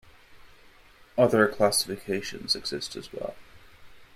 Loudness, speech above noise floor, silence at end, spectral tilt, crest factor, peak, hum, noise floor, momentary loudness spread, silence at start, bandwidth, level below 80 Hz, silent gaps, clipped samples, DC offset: -26 LUFS; 28 dB; 0.1 s; -3.5 dB/octave; 24 dB; -6 dBFS; none; -54 dBFS; 15 LU; 0.3 s; 15.5 kHz; -58 dBFS; none; under 0.1%; under 0.1%